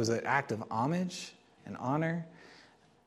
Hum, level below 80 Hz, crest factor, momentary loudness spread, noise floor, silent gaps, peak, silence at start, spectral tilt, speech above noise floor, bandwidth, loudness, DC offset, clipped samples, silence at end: none; -74 dBFS; 20 dB; 18 LU; -61 dBFS; none; -14 dBFS; 0 s; -5.5 dB/octave; 28 dB; 13.5 kHz; -34 LUFS; under 0.1%; under 0.1%; 0.45 s